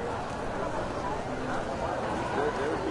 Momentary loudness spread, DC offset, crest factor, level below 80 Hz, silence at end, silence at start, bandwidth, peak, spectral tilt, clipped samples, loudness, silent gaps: 4 LU; under 0.1%; 16 dB; -46 dBFS; 0 s; 0 s; 11.5 kHz; -16 dBFS; -5.5 dB/octave; under 0.1%; -32 LUFS; none